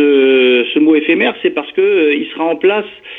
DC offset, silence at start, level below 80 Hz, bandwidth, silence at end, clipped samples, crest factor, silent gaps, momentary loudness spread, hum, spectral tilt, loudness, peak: under 0.1%; 0 s; -62 dBFS; 4 kHz; 0 s; under 0.1%; 12 dB; none; 7 LU; none; -7 dB/octave; -12 LUFS; 0 dBFS